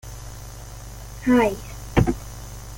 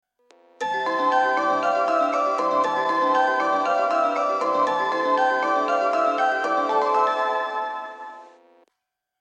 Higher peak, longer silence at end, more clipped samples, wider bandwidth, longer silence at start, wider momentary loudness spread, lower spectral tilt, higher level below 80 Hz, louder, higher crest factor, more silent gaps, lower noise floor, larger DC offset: first, -4 dBFS vs -8 dBFS; second, 0 s vs 0.95 s; neither; first, 17 kHz vs 9.4 kHz; second, 0.05 s vs 0.6 s; first, 20 LU vs 7 LU; first, -6.5 dB/octave vs -3.5 dB/octave; first, -36 dBFS vs -88 dBFS; about the same, -22 LUFS vs -22 LUFS; first, 20 dB vs 14 dB; neither; second, -37 dBFS vs -80 dBFS; neither